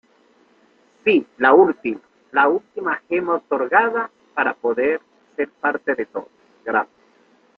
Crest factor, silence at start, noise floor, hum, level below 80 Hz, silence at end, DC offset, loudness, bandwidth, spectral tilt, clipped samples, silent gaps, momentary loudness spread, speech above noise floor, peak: 20 dB; 1.05 s; -57 dBFS; none; -66 dBFS; 0.75 s; under 0.1%; -20 LUFS; 4.9 kHz; -7 dB/octave; under 0.1%; none; 13 LU; 38 dB; -2 dBFS